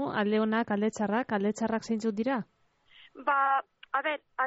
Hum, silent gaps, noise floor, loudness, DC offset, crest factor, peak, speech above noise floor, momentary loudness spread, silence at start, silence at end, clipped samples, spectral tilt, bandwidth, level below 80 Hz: none; none; -60 dBFS; -30 LUFS; under 0.1%; 14 dB; -16 dBFS; 31 dB; 7 LU; 0 s; 0 s; under 0.1%; -4 dB/octave; 8 kHz; -72 dBFS